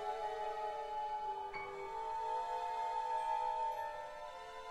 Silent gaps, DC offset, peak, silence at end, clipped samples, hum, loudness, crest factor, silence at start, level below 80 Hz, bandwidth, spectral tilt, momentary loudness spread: none; under 0.1%; -28 dBFS; 0 s; under 0.1%; none; -41 LUFS; 14 dB; 0 s; -66 dBFS; 12.5 kHz; -2.5 dB/octave; 9 LU